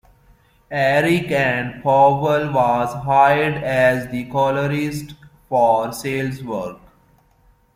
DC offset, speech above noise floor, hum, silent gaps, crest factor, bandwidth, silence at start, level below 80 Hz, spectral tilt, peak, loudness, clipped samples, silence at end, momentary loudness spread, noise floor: under 0.1%; 38 dB; none; none; 16 dB; 16.5 kHz; 0.7 s; -50 dBFS; -6 dB/octave; -2 dBFS; -18 LUFS; under 0.1%; 1 s; 12 LU; -56 dBFS